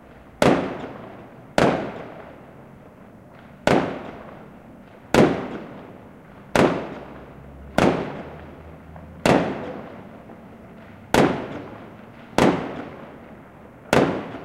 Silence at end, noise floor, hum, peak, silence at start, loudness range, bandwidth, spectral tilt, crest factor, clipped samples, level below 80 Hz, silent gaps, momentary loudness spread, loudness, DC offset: 0 s; -45 dBFS; none; -2 dBFS; 0.15 s; 3 LU; 16 kHz; -5.5 dB/octave; 22 dB; under 0.1%; -48 dBFS; none; 24 LU; -22 LUFS; under 0.1%